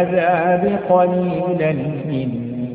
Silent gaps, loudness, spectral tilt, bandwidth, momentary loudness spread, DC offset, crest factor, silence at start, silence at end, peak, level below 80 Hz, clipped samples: none; -18 LUFS; -13 dB/octave; 4.6 kHz; 7 LU; under 0.1%; 14 dB; 0 s; 0 s; -2 dBFS; -52 dBFS; under 0.1%